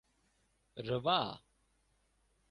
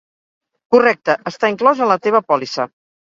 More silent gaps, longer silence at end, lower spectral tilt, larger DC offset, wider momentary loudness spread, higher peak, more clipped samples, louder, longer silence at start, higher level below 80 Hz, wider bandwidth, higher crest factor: neither; first, 1.15 s vs 0.4 s; first, -6.5 dB/octave vs -5 dB/octave; neither; first, 21 LU vs 9 LU; second, -16 dBFS vs 0 dBFS; neither; second, -35 LUFS vs -16 LUFS; about the same, 0.75 s vs 0.7 s; second, -70 dBFS vs -64 dBFS; first, 11.5 kHz vs 7.6 kHz; first, 26 dB vs 16 dB